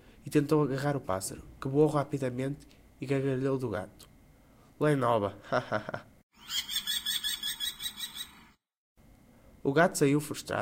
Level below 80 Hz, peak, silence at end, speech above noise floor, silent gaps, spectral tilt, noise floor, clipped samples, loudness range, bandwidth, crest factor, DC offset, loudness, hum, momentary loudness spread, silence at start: -62 dBFS; -10 dBFS; 0 s; 30 dB; 6.23-6.30 s, 8.77-8.95 s; -4.5 dB/octave; -59 dBFS; under 0.1%; 3 LU; 16 kHz; 22 dB; under 0.1%; -31 LUFS; none; 13 LU; 0.25 s